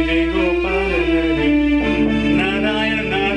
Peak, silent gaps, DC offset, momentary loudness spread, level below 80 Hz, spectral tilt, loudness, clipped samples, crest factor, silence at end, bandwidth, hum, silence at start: -6 dBFS; none; under 0.1%; 2 LU; -30 dBFS; -6.5 dB/octave; -17 LUFS; under 0.1%; 10 dB; 0 s; 9.8 kHz; none; 0 s